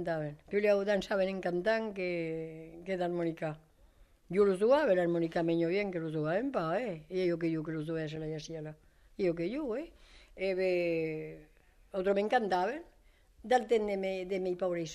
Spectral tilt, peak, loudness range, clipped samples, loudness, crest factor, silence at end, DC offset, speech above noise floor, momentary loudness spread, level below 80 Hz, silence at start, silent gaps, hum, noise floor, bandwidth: -6.5 dB/octave; -16 dBFS; 5 LU; under 0.1%; -33 LUFS; 18 dB; 0 s; under 0.1%; 31 dB; 12 LU; -62 dBFS; 0 s; none; none; -63 dBFS; 12.5 kHz